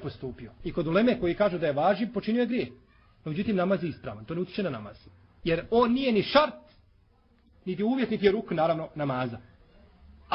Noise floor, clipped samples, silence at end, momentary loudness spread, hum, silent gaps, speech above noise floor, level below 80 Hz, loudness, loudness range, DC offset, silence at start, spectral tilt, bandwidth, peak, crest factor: -62 dBFS; under 0.1%; 0 s; 15 LU; none; none; 35 dB; -54 dBFS; -27 LUFS; 4 LU; under 0.1%; 0 s; -10 dB/octave; 5.8 kHz; -6 dBFS; 22 dB